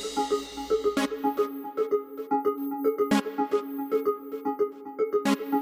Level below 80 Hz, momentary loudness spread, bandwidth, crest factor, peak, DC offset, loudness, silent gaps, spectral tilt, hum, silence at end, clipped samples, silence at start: -62 dBFS; 5 LU; 16 kHz; 16 dB; -12 dBFS; under 0.1%; -28 LUFS; none; -4.5 dB/octave; none; 0 s; under 0.1%; 0 s